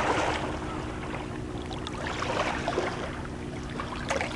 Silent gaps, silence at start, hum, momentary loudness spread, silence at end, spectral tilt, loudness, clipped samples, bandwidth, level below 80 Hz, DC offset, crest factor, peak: none; 0 s; none; 7 LU; 0 s; -5 dB/octave; -32 LUFS; under 0.1%; 11.5 kHz; -44 dBFS; under 0.1%; 18 dB; -14 dBFS